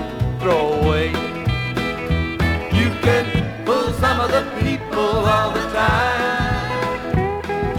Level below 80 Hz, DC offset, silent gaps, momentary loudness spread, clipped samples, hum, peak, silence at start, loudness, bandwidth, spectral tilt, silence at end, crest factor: -32 dBFS; under 0.1%; none; 5 LU; under 0.1%; none; -4 dBFS; 0 s; -19 LUFS; 17 kHz; -6 dB/octave; 0 s; 16 dB